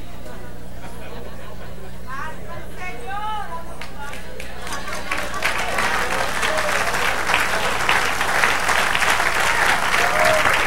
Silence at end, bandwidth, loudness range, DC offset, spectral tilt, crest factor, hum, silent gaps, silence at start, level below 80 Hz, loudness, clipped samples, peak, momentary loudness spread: 0 s; 16 kHz; 14 LU; 6%; -2 dB/octave; 22 dB; 60 Hz at -40 dBFS; none; 0 s; -38 dBFS; -19 LUFS; under 0.1%; 0 dBFS; 20 LU